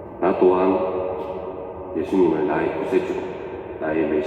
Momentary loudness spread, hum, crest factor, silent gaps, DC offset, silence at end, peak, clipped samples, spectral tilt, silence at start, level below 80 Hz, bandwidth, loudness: 14 LU; none; 18 dB; none; under 0.1%; 0 s; -4 dBFS; under 0.1%; -8 dB/octave; 0 s; -54 dBFS; 7.4 kHz; -22 LUFS